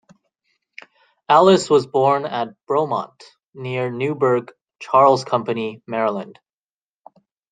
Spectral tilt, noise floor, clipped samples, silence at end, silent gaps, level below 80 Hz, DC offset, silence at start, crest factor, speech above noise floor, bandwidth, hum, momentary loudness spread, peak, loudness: -5.5 dB/octave; under -90 dBFS; under 0.1%; 1.2 s; 3.49-3.53 s; -68 dBFS; under 0.1%; 1.3 s; 18 dB; over 72 dB; 9.4 kHz; none; 14 LU; -2 dBFS; -18 LUFS